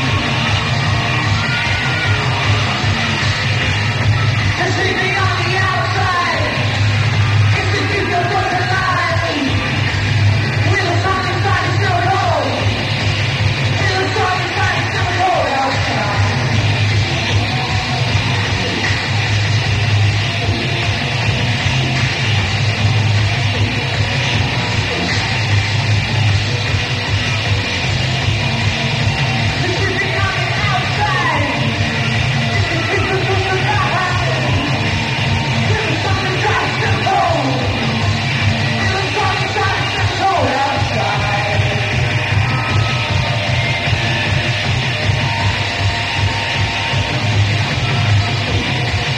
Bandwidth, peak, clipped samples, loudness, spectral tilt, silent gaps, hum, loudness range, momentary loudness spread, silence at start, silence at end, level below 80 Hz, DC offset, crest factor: 10 kHz; -2 dBFS; under 0.1%; -15 LUFS; -5 dB/octave; none; none; 1 LU; 2 LU; 0 s; 0 s; -32 dBFS; under 0.1%; 12 dB